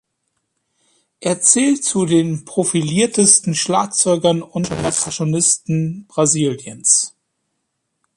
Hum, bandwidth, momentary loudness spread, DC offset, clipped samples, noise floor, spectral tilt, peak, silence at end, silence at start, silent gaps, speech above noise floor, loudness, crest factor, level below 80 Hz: none; 11.5 kHz; 9 LU; under 0.1%; under 0.1%; -73 dBFS; -3.5 dB/octave; 0 dBFS; 1.1 s; 1.2 s; none; 56 dB; -16 LUFS; 18 dB; -54 dBFS